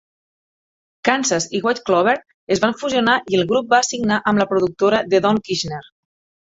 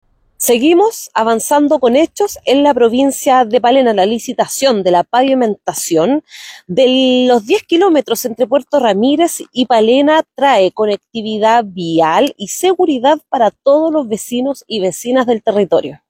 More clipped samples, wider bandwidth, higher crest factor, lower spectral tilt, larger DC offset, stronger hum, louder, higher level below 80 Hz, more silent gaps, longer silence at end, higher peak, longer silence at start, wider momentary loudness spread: neither; second, 8 kHz vs 17 kHz; first, 18 dB vs 12 dB; about the same, -3.5 dB/octave vs -4 dB/octave; neither; neither; second, -18 LUFS vs -13 LUFS; about the same, -56 dBFS vs -56 dBFS; first, 2.34-2.47 s vs none; first, 0.7 s vs 0.15 s; about the same, 0 dBFS vs 0 dBFS; first, 1.05 s vs 0.4 s; about the same, 7 LU vs 7 LU